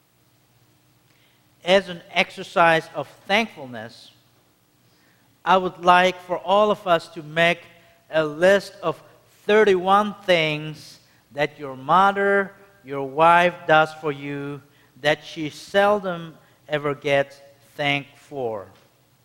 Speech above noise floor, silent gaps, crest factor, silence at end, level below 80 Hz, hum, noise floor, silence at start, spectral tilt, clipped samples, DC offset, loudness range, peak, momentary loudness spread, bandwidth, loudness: 40 dB; none; 22 dB; 0.6 s; -62 dBFS; none; -61 dBFS; 1.65 s; -5 dB/octave; under 0.1%; under 0.1%; 4 LU; 0 dBFS; 17 LU; 16.5 kHz; -21 LUFS